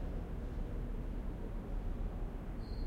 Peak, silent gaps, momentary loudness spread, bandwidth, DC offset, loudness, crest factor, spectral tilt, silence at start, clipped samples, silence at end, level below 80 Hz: -30 dBFS; none; 2 LU; 5.2 kHz; under 0.1%; -44 LUFS; 10 dB; -8.5 dB/octave; 0 s; under 0.1%; 0 s; -40 dBFS